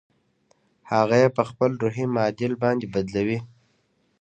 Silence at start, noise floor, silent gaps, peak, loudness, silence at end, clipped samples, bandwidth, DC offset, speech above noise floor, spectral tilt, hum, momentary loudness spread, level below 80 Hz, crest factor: 0.85 s; -67 dBFS; none; -4 dBFS; -23 LUFS; 0.75 s; under 0.1%; 8.8 kHz; under 0.1%; 45 dB; -7 dB/octave; none; 7 LU; -58 dBFS; 20 dB